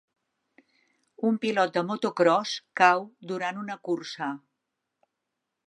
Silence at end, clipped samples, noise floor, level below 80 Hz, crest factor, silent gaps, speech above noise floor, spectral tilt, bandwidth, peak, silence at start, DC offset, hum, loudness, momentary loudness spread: 1.3 s; under 0.1%; -84 dBFS; -84 dBFS; 24 dB; none; 57 dB; -4.5 dB/octave; 11 kHz; -4 dBFS; 1.2 s; under 0.1%; none; -26 LUFS; 13 LU